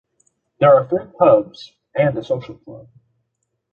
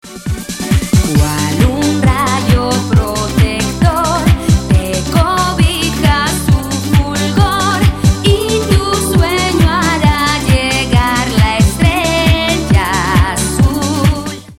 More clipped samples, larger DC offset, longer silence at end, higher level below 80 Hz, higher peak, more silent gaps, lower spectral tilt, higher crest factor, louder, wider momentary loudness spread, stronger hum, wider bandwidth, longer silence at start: neither; neither; first, 0.95 s vs 0.05 s; second, -58 dBFS vs -20 dBFS; about the same, -2 dBFS vs 0 dBFS; neither; first, -8.5 dB/octave vs -5 dB/octave; first, 18 dB vs 12 dB; second, -17 LUFS vs -12 LUFS; first, 20 LU vs 3 LU; neither; second, 6.8 kHz vs 16.5 kHz; first, 0.6 s vs 0.05 s